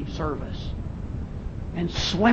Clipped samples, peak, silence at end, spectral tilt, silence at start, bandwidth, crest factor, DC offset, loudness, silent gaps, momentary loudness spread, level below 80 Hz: under 0.1%; -6 dBFS; 0 s; -5.5 dB/octave; 0 s; 8.4 kHz; 20 dB; under 0.1%; -30 LUFS; none; 9 LU; -36 dBFS